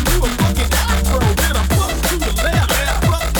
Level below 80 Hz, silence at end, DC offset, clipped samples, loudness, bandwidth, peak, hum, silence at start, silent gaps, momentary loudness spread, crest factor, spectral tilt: -18 dBFS; 0 s; under 0.1%; under 0.1%; -16 LUFS; over 20 kHz; -4 dBFS; none; 0 s; none; 2 LU; 12 dB; -4 dB/octave